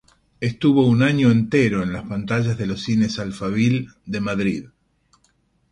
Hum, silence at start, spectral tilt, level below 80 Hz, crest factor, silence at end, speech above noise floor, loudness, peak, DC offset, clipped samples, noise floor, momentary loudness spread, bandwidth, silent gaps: none; 0.4 s; -7 dB/octave; -50 dBFS; 16 dB; 1.05 s; 44 dB; -20 LUFS; -4 dBFS; under 0.1%; under 0.1%; -63 dBFS; 11 LU; 11 kHz; none